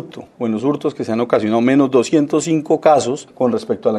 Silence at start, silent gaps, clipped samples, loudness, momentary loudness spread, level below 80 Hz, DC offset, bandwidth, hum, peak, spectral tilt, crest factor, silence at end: 0 s; none; under 0.1%; -16 LUFS; 8 LU; -62 dBFS; under 0.1%; 11.5 kHz; none; 0 dBFS; -6 dB/octave; 16 dB; 0 s